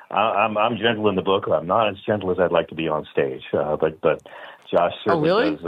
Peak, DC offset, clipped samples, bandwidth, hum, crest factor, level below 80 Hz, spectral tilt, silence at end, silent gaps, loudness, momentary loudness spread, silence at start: -4 dBFS; under 0.1%; under 0.1%; 5.6 kHz; none; 18 dB; -58 dBFS; -7.5 dB/octave; 0 s; none; -21 LUFS; 6 LU; 0 s